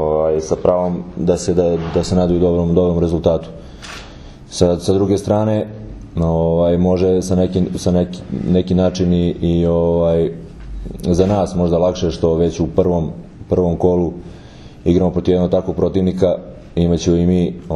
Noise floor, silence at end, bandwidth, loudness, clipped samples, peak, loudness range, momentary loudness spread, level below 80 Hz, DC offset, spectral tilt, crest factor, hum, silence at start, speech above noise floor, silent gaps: -37 dBFS; 0 s; 11.5 kHz; -16 LUFS; under 0.1%; 0 dBFS; 2 LU; 13 LU; -34 dBFS; under 0.1%; -7.5 dB/octave; 16 dB; none; 0 s; 21 dB; none